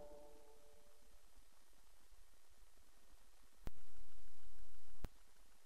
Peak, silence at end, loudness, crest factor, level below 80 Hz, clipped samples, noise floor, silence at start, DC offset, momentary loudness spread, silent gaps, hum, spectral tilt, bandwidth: -32 dBFS; 0 s; -63 LUFS; 6 dB; -62 dBFS; under 0.1%; -70 dBFS; 0 s; under 0.1%; 11 LU; none; none; -5 dB/octave; 13 kHz